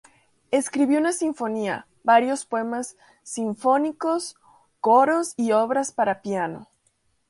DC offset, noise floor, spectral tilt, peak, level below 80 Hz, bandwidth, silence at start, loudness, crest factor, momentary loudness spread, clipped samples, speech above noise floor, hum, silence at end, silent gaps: under 0.1%; -68 dBFS; -4 dB/octave; -6 dBFS; -72 dBFS; 11.5 kHz; 0.5 s; -23 LUFS; 18 dB; 11 LU; under 0.1%; 45 dB; none; 0.65 s; none